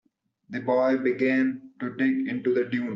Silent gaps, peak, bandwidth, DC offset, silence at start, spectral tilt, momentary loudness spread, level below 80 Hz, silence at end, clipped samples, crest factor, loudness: none; -12 dBFS; 6 kHz; under 0.1%; 0.5 s; -5.5 dB/octave; 11 LU; -72 dBFS; 0 s; under 0.1%; 14 dB; -25 LUFS